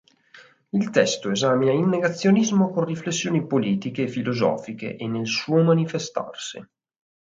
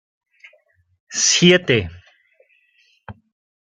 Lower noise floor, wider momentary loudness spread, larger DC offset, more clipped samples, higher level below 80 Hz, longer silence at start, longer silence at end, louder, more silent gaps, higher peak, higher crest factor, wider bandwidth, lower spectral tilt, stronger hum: second, -51 dBFS vs -60 dBFS; second, 11 LU vs 15 LU; neither; neither; second, -66 dBFS vs -56 dBFS; second, 0.35 s vs 1.1 s; about the same, 0.55 s vs 0.65 s; second, -23 LUFS vs -15 LUFS; neither; about the same, -4 dBFS vs -2 dBFS; about the same, 20 dB vs 20 dB; second, 7.8 kHz vs 9.4 kHz; first, -5.5 dB/octave vs -3 dB/octave; neither